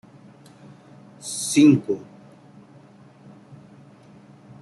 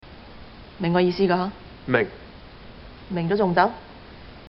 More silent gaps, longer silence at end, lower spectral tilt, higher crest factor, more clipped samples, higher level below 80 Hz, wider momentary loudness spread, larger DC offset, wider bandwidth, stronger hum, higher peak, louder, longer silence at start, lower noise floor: neither; first, 2.6 s vs 0 s; about the same, -5 dB/octave vs -5 dB/octave; about the same, 20 dB vs 24 dB; neither; second, -70 dBFS vs -48 dBFS; second, 16 LU vs 24 LU; neither; first, 12.5 kHz vs 5.8 kHz; neither; about the same, -4 dBFS vs -2 dBFS; first, -20 LUFS vs -23 LUFS; first, 1.25 s vs 0.05 s; first, -49 dBFS vs -43 dBFS